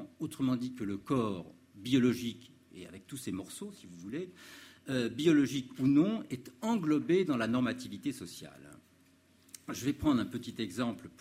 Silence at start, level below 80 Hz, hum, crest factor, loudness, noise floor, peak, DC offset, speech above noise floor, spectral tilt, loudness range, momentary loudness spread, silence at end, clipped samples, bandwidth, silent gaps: 0 s; -64 dBFS; none; 18 dB; -33 LUFS; -65 dBFS; -14 dBFS; under 0.1%; 32 dB; -6 dB/octave; 6 LU; 21 LU; 0.1 s; under 0.1%; 15.5 kHz; none